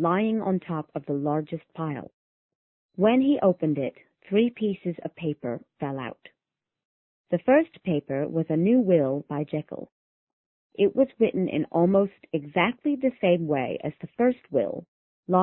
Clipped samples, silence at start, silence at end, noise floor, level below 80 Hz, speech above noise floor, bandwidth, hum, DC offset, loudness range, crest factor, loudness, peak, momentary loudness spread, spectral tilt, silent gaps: under 0.1%; 0 s; 0 s; -88 dBFS; -66 dBFS; 63 dB; 4 kHz; none; under 0.1%; 4 LU; 20 dB; -26 LUFS; -6 dBFS; 12 LU; -11.5 dB/octave; 2.13-2.49 s, 2.55-2.89 s, 6.85-7.24 s, 9.92-10.27 s, 10.33-10.70 s, 14.88-15.23 s